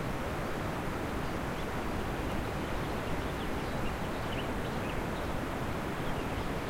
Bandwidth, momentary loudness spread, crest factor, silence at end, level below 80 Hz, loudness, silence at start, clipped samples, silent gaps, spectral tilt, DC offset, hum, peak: 16 kHz; 1 LU; 14 dB; 0 s; -42 dBFS; -36 LUFS; 0 s; under 0.1%; none; -5.5 dB/octave; under 0.1%; none; -22 dBFS